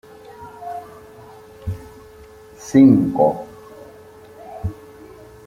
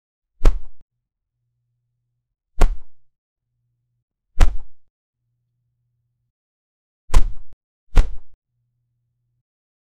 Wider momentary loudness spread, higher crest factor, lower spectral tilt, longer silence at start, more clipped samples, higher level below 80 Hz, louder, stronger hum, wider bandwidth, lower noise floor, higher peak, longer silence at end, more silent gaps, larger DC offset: first, 29 LU vs 18 LU; about the same, 20 dB vs 20 dB; first, -8 dB/octave vs -5.5 dB/octave; about the same, 0.4 s vs 0.4 s; neither; second, -48 dBFS vs -22 dBFS; first, -17 LUFS vs -25 LUFS; neither; first, 10.5 kHz vs 9.4 kHz; second, -43 dBFS vs -79 dBFS; about the same, -2 dBFS vs 0 dBFS; second, 0.75 s vs 1.65 s; second, none vs 0.82-0.88 s, 3.18-3.36 s, 4.02-4.08 s, 4.90-5.13 s, 6.30-7.08 s, 7.53-7.87 s; neither